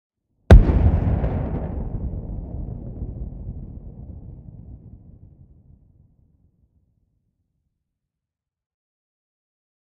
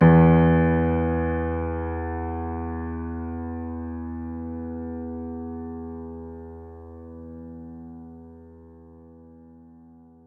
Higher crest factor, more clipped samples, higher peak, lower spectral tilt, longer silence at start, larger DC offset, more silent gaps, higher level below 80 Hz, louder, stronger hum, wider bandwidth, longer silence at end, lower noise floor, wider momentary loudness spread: about the same, 24 dB vs 20 dB; neither; first, 0 dBFS vs -6 dBFS; second, -9 dB/octave vs -12 dB/octave; first, 0.5 s vs 0 s; neither; neither; first, -26 dBFS vs -42 dBFS; first, -21 LUFS vs -25 LUFS; neither; first, 6.6 kHz vs 3.3 kHz; first, 5.1 s vs 1 s; first, -87 dBFS vs -50 dBFS; first, 28 LU vs 23 LU